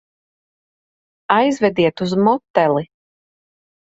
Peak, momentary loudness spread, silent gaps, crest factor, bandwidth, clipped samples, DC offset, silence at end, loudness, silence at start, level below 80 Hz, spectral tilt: 0 dBFS; 3 LU; 2.50-2.54 s; 20 dB; 8 kHz; under 0.1%; under 0.1%; 1.1 s; -17 LUFS; 1.3 s; -60 dBFS; -6.5 dB/octave